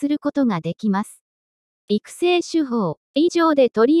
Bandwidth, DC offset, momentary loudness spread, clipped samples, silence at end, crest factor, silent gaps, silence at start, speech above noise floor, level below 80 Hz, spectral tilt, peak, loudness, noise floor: 12 kHz; under 0.1%; 9 LU; under 0.1%; 0 s; 14 dB; 1.21-1.88 s, 2.97-3.14 s; 0 s; over 71 dB; -68 dBFS; -6 dB/octave; -6 dBFS; -20 LUFS; under -90 dBFS